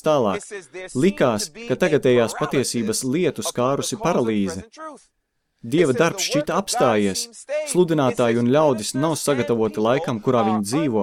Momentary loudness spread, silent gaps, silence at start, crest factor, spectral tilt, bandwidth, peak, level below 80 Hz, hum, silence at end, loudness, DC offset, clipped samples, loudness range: 9 LU; none; 0.05 s; 16 dB; -5 dB/octave; 16.5 kHz; -4 dBFS; -56 dBFS; none; 0 s; -21 LUFS; under 0.1%; under 0.1%; 3 LU